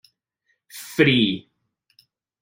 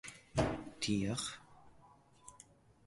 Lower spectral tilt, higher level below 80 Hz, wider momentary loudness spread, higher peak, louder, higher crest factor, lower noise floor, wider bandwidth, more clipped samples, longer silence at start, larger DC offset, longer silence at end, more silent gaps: about the same, -5.5 dB/octave vs -4.5 dB/octave; about the same, -60 dBFS vs -58 dBFS; about the same, 22 LU vs 22 LU; first, -4 dBFS vs -20 dBFS; first, -20 LUFS vs -38 LUFS; about the same, 20 dB vs 22 dB; first, -72 dBFS vs -64 dBFS; first, 16.5 kHz vs 11.5 kHz; neither; first, 0.75 s vs 0.05 s; neither; first, 1.05 s vs 0.5 s; neither